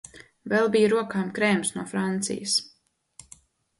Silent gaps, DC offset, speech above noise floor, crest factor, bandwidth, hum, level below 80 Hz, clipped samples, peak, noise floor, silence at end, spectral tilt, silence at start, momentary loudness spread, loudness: none; under 0.1%; 30 dB; 18 dB; 11.5 kHz; none; -66 dBFS; under 0.1%; -8 dBFS; -55 dBFS; 1.1 s; -4 dB/octave; 0.15 s; 8 LU; -25 LUFS